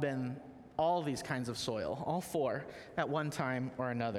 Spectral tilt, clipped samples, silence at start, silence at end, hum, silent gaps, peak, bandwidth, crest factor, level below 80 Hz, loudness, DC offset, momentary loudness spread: -5.5 dB/octave; under 0.1%; 0 s; 0 s; none; none; -18 dBFS; 17 kHz; 18 dB; -66 dBFS; -37 LUFS; under 0.1%; 9 LU